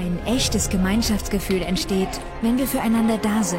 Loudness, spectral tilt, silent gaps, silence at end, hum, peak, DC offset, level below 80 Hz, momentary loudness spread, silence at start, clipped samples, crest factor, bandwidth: -22 LUFS; -4.5 dB/octave; none; 0 s; none; -8 dBFS; under 0.1%; -32 dBFS; 4 LU; 0 s; under 0.1%; 12 dB; 16.5 kHz